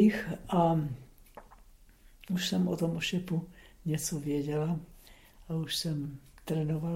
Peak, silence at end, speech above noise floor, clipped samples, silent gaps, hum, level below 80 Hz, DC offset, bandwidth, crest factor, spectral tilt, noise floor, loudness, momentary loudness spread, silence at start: -14 dBFS; 0 s; 26 dB; under 0.1%; none; none; -56 dBFS; under 0.1%; 16.5 kHz; 18 dB; -5.5 dB/octave; -57 dBFS; -32 LUFS; 14 LU; 0 s